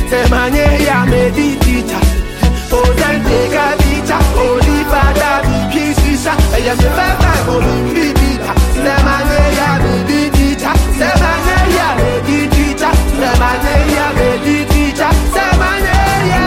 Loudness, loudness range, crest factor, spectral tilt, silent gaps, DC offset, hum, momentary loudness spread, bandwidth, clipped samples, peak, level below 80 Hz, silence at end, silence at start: -12 LUFS; 1 LU; 10 dB; -5.5 dB/octave; none; 0.2%; none; 2 LU; 16.5 kHz; under 0.1%; 0 dBFS; -16 dBFS; 0 s; 0 s